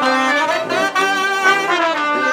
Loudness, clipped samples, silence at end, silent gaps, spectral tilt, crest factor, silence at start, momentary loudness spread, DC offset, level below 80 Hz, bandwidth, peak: -15 LUFS; under 0.1%; 0 s; none; -2 dB/octave; 14 dB; 0 s; 3 LU; under 0.1%; -70 dBFS; 18.5 kHz; -2 dBFS